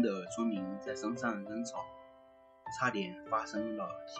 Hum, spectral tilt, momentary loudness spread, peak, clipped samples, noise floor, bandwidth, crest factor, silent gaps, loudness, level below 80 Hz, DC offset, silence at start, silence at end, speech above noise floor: none; -5 dB/octave; 11 LU; -18 dBFS; under 0.1%; -61 dBFS; 9 kHz; 20 dB; none; -37 LUFS; -72 dBFS; under 0.1%; 0 s; 0 s; 23 dB